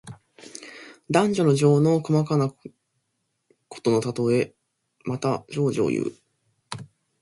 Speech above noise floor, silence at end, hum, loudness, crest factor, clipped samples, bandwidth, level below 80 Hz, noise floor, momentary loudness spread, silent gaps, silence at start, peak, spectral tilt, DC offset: 54 dB; 0.35 s; none; -23 LUFS; 20 dB; under 0.1%; 11.5 kHz; -64 dBFS; -76 dBFS; 21 LU; none; 0.05 s; -4 dBFS; -7 dB/octave; under 0.1%